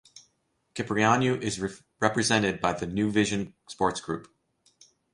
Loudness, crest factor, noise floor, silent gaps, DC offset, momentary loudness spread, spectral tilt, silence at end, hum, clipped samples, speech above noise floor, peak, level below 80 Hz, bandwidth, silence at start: -27 LUFS; 24 dB; -73 dBFS; none; under 0.1%; 13 LU; -4.5 dB/octave; 0.9 s; none; under 0.1%; 46 dB; -4 dBFS; -56 dBFS; 11.5 kHz; 0.15 s